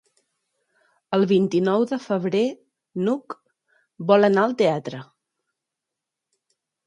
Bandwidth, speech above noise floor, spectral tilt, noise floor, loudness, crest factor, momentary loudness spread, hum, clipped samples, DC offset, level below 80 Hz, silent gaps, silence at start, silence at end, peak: 10 kHz; 65 dB; -7 dB/octave; -85 dBFS; -21 LUFS; 20 dB; 18 LU; none; under 0.1%; under 0.1%; -72 dBFS; none; 1.1 s; 1.85 s; -4 dBFS